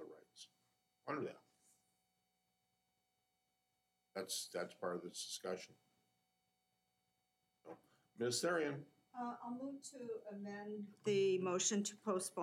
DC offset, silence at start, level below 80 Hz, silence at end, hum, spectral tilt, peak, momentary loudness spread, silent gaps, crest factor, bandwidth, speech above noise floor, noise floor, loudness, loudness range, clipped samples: under 0.1%; 0 s; under -90 dBFS; 0 s; 60 Hz at -75 dBFS; -3.5 dB/octave; -24 dBFS; 23 LU; none; 22 dB; 16 kHz; 44 dB; -86 dBFS; -43 LUFS; 13 LU; under 0.1%